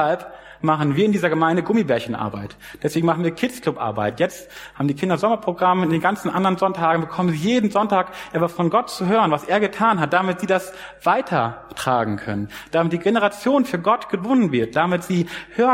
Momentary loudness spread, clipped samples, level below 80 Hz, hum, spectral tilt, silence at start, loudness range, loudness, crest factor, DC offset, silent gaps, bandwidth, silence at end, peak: 8 LU; under 0.1%; -56 dBFS; none; -6.5 dB/octave; 0 s; 2 LU; -20 LUFS; 18 dB; under 0.1%; none; 16 kHz; 0 s; -2 dBFS